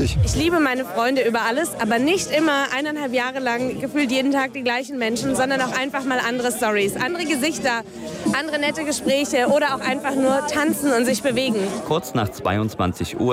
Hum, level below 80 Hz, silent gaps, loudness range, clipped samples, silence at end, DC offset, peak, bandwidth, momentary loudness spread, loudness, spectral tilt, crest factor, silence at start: none; -42 dBFS; none; 2 LU; under 0.1%; 0 s; under 0.1%; -8 dBFS; 16 kHz; 5 LU; -21 LUFS; -4.5 dB/octave; 12 dB; 0 s